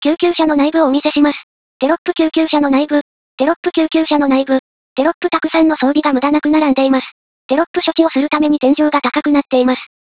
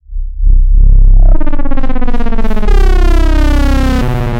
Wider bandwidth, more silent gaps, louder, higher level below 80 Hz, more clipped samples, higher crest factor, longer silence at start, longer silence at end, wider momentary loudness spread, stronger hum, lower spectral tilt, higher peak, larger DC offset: second, 4 kHz vs 6.6 kHz; first, 1.43-1.80 s, 1.98-2.05 s, 3.01-3.38 s, 3.56-3.63 s, 4.59-4.96 s, 5.14-5.21 s, 7.12-7.49 s, 7.67-7.74 s vs none; about the same, -14 LUFS vs -13 LUFS; second, -54 dBFS vs -6 dBFS; second, under 0.1% vs 0.6%; first, 14 dB vs 6 dB; about the same, 0 s vs 0.1 s; first, 0.35 s vs 0 s; about the same, 5 LU vs 7 LU; neither; first, -8.5 dB/octave vs -7 dB/octave; about the same, 0 dBFS vs 0 dBFS; first, 0.3% vs under 0.1%